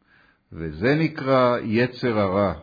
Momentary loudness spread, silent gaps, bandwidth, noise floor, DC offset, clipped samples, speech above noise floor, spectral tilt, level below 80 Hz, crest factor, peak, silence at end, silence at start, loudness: 7 LU; none; 5 kHz; -59 dBFS; under 0.1%; under 0.1%; 38 dB; -8.5 dB/octave; -50 dBFS; 16 dB; -8 dBFS; 0 s; 0.5 s; -22 LUFS